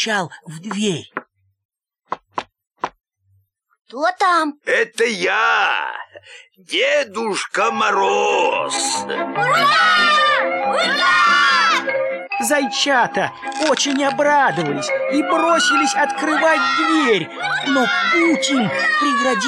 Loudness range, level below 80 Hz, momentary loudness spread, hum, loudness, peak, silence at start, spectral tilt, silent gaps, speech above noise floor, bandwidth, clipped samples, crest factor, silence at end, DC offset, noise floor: 9 LU; -70 dBFS; 15 LU; none; -16 LUFS; -4 dBFS; 0 s; -2.5 dB/octave; 1.65-1.69 s; 44 dB; 15.5 kHz; under 0.1%; 14 dB; 0 s; under 0.1%; -61 dBFS